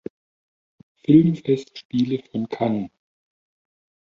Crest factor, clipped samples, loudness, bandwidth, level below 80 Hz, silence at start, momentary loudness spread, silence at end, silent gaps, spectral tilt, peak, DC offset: 20 dB; under 0.1%; -21 LUFS; 7.4 kHz; -62 dBFS; 1.1 s; 16 LU; 1.2 s; 1.85-1.90 s; -9 dB/octave; -2 dBFS; under 0.1%